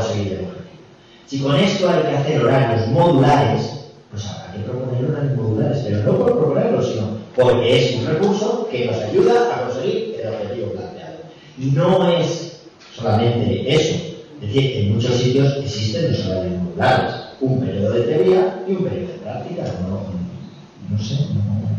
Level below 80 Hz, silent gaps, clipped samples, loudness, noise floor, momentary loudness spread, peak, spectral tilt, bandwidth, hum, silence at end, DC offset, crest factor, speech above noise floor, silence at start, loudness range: -50 dBFS; none; under 0.1%; -19 LUFS; -45 dBFS; 14 LU; -6 dBFS; -6.5 dB/octave; 9.2 kHz; none; 0 s; under 0.1%; 12 dB; 27 dB; 0 s; 4 LU